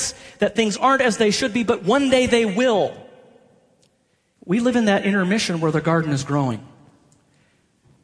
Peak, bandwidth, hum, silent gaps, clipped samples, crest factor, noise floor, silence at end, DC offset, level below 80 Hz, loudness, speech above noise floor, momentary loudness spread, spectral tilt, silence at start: -2 dBFS; 11 kHz; none; none; under 0.1%; 18 dB; -65 dBFS; 1.4 s; under 0.1%; -54 dBFS; -19 LUFS; 46 dB; 7 LU; -5 dB/octave; 0 s